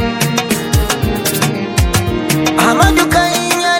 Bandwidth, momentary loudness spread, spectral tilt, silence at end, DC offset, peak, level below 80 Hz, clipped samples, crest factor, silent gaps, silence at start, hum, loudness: 19 kHz; 5 LU; -4 dB/octave; 0 s; under 0.1%; 0 dBFS; -24 dBFS; under 0.1%; 14 dB; none; 0 s; none; -13 LUFS